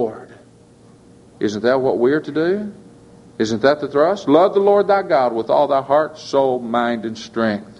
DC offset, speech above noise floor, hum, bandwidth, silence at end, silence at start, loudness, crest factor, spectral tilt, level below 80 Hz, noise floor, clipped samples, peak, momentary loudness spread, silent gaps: under 0.1%; 30 dB; none; 11 kHz; 0.05 s; 0 s; -17 LUFS; 18 dB; -6 dB/octave; -60 dBFS; -47 dBFS; under 0.1%; 0 dBFS; 10 LU; none